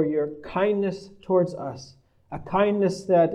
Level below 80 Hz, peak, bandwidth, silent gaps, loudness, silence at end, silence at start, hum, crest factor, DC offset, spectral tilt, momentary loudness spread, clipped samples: -56 dBFS; -8 dBFS; 10.5 kHz; none; -24 LUFS; 0 s; 0 s; none; 16 dB; under 0.1%; -7 dB/octave; 17 LU; under 0.1%